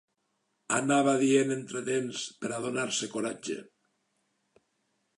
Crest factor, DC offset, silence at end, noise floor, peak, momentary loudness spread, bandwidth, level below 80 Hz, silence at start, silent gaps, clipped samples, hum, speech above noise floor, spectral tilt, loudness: 18 dB; under 0.1%; 1.55 s; -78 dBFS; -12 dBFS; 11 LU; 11.5 kHz; -82 dBFS; 0.7 s; none; under 0.1%; none; 49 dB; -4 dB/octave; -29 LUFS